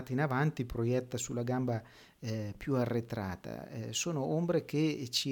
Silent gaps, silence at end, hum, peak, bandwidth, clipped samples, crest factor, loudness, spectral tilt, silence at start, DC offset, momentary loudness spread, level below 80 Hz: none; 0 s; none; -18 dBFS; 19 kHz; under 0.1%; 16 dB; -34 LUFS; -5 dB/octave; 0 s; under 0.1%; 9 LU; -60 dBFS